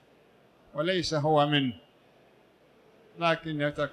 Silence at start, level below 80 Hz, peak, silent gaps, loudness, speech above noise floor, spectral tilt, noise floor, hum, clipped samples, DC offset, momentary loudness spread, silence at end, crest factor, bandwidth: 0.75 s; -62 dBFS; -12 dBFS; none; -28 LUFS; 33 dB; -5.5 dB/octave; -61 dBFS; none; under 0.1%; under 0.1%; 10 LU; 0 s; 20 dB; 10.5 kHz